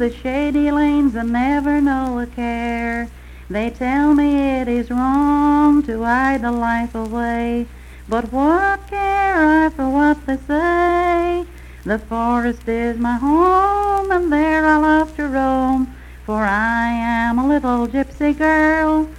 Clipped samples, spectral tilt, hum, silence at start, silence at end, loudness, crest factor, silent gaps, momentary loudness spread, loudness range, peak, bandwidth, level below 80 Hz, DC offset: under 0.1%; -6.5 dB/octave; none; 0 s; 0 s; -17 LUFS; 14 dB; none; 9 LU; 3 LU; -4 dBFS; 12 kHz; -34 dBFS; under 0.1%